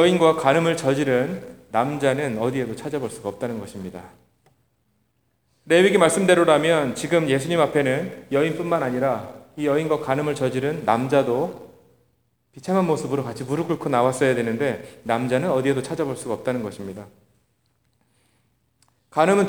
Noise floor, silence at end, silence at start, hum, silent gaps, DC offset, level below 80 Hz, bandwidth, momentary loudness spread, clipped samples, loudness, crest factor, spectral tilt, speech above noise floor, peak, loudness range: -68 dBFS; 0 s; 0 s; none; none; 0.1%; -62 dBFS; over 20 kHz; 13 LU; under 0.1%; -22 LUFS; 20 dB; -5.5 dB/octave; 47 dB; -2 dBFS; 9 LU